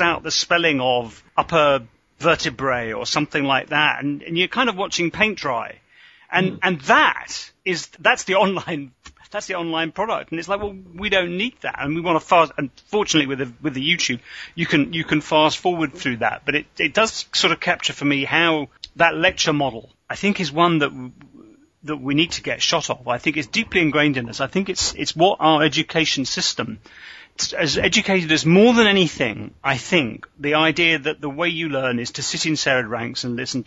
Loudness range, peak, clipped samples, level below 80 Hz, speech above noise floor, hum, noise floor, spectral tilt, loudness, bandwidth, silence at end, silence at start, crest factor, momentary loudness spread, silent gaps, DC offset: 4 LU; 0 dBFS; under 0.1%; -52 dBFS; 24 dB; none; -44 dBFS; -3.5 dB/octave; -19 LUFS; 8 kHz; 0.05 s; 0 s; 20 dB; 10 LU; none; under 0.1%